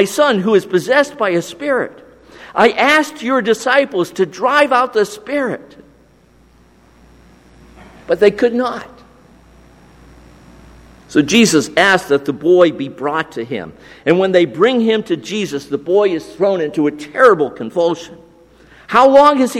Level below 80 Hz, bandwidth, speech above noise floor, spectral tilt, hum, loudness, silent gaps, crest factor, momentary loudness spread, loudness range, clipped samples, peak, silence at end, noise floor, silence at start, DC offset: -52 dBFS; 16 kHz; 35 dB; -4.5 dB/octave; none; -14 LUFS; none; 16 dB; 11 LU; 6 LU; under 0.1%; 0 dBFS; 0 s; -49 dBFS; 0 s; under 0.1%